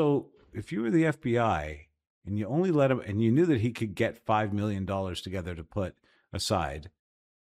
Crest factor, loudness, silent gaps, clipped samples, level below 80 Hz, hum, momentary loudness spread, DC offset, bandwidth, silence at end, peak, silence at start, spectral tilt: 16 dB; -29 LUFS; 2.10-2.22 s; under 0.1%; -52 dBFS; none; 14 LU; under 0.1%; 15 kHz; 0.65 s; -14 dBFS; 0 s; -6.5 dB/octave